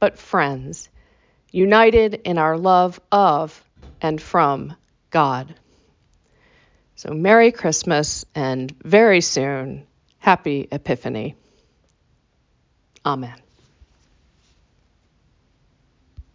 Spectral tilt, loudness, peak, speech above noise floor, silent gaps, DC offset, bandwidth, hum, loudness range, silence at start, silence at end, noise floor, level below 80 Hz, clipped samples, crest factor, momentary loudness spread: -4.5 dB/octave; -18 LUFS; -2 dBFS; 45 dB; none; under 0.1%; 7.6 kHz; none; 16 LU; 0 s; 0.15 s; -63 dBFS; -48 dBFS; under 0.1%; 20 dB; 18 LU